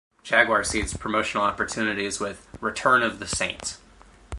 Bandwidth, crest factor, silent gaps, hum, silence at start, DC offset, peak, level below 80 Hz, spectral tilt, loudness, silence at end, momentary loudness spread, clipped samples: 11.5 kHz; 24 dB; none; none; 0.25 s; under 0.1%; -2 dBFS; -46 dBFS; -3 dB/octave; -24 LUFS; 0 s; 12 LU; under 0.1%